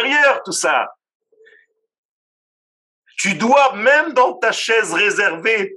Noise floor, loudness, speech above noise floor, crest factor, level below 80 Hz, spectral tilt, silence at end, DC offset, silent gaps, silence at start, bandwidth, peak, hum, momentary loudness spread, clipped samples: -55 dBFS; -15 LUFS; 39 dB; 18 dB; -84 dBFS; -2 dB/octave; 0 s; under 0.1%; 1.15-1.20 s, 1.98-3.02 s; 0 s; 12.5 kHz; 0 dBFS; none; 7 LU; under 0.1%